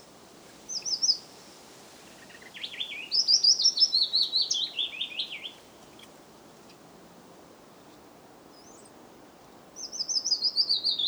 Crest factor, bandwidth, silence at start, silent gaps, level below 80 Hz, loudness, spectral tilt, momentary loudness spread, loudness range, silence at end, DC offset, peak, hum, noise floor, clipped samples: 22 dB; over 20 kHz; 0.05 s; none; -74 dBFS; -24 LUFS; 1.5 dB/octave; 20 LU; 16 LU; 0 s; under 0.1%; -10 dBFS; none; -52 dBFS; under 0.1%